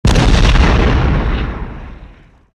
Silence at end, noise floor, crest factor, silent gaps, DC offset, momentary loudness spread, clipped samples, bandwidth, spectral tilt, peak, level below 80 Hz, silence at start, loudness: 0.5 s; -39 dBFS; 12 dB; none; under 0.1%; 16 LU; under 0.1%; 10.5 kHz; -6 dB/octave; 0 dBFS; -14 dBFS; 0.05 s; -13 LUFS